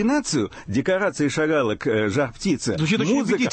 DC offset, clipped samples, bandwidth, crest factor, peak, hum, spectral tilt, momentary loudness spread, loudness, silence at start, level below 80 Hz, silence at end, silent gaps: under 0.1%; under 0.1%; 8.8 kHz; 12 dB; -10 dBFS; none; -5 dB/octave; 4 LU; -22 LUFS; 0 s; -50 dBFS; 0 s; none